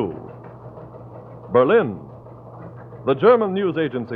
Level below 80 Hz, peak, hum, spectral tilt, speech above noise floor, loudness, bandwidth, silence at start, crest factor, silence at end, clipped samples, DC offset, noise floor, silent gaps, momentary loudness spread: -58 dBFS; -2 dBFS; none; -10 dB/octave; 22 dB; -19 LUFS; 4.7 kHz; 0 s; 20 dB; 0 s; under 0.1%; under 0.1%; -40 dBFS; none; 24 LU